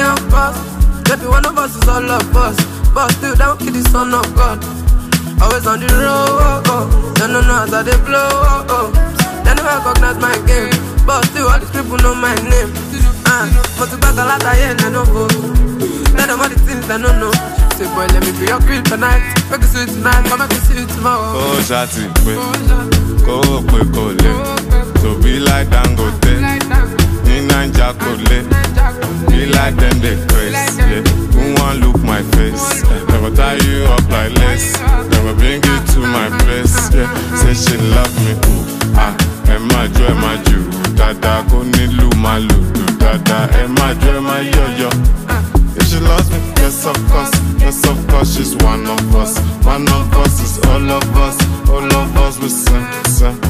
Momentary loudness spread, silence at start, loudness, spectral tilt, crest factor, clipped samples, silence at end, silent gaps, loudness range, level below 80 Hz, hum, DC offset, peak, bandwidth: 3 LU; 0 s; -13 LUFS; -4.5 dB/octave; 10 dB; under 0.1%; 0 s; none; 1 LU; -14 dBFS; none; under 0.1%; 0 dBFS; 15.5 kHz